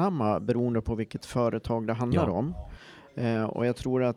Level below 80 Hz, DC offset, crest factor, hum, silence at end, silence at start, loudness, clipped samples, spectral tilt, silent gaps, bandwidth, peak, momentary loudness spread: -46 dBFS; under 0.1%; 16 dB; none; 0 s; 0 s; -29 LUFS; under 0.1%; -8 dB/octave; none; 12 kHz; -12 dBFS; 11 LU